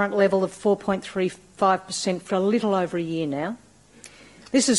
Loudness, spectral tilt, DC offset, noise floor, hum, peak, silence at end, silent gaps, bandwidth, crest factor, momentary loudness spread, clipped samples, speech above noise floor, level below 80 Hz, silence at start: -24 LUFS; -4.5 dB/octave; under 0.1%; -49 dBFS; none; -8 dBFS; 0 s; none; 11.5 kHz; 16 dB; 7 LU; under 0.1%; 26 dB; -62 dBFS; 0 s